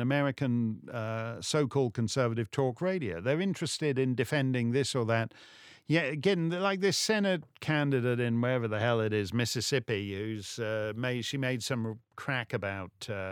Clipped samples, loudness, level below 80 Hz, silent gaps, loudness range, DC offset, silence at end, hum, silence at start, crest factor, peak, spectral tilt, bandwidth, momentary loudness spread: under 0.1%; -31 LUFS; -70 dBFS; none; 4 LU; under 0.1%; 0 s; none; 0 s; 20 dB; -12 dBFS; -5 dB/octave; 17.5 kHz; 8 LU